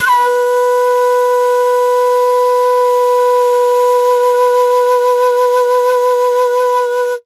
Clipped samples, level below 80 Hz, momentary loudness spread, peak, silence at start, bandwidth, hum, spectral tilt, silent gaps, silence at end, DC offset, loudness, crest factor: under 0.1%; -70 dBFS; 1 LU; -4 dBFS; 0 s; 13.5 kHz; none; 0.5 dB/octave; none; 0.05 s; under 0.1%; -12 LUFS; 8 dB